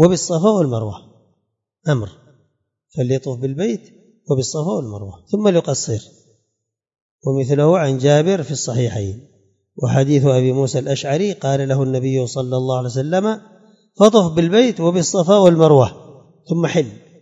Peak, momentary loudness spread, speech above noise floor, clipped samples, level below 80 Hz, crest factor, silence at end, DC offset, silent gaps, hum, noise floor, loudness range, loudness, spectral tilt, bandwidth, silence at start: 0 dBFS; 14 LU; 60 dB; under 0.1%; -56 dBFS; 18 dB; 0.25 s; under 0.1%; 7.02-7.19 s; none; -76 dBFS; 9 LU; -17 LUFS; -6 dB/octave; 8 kHz; 0 s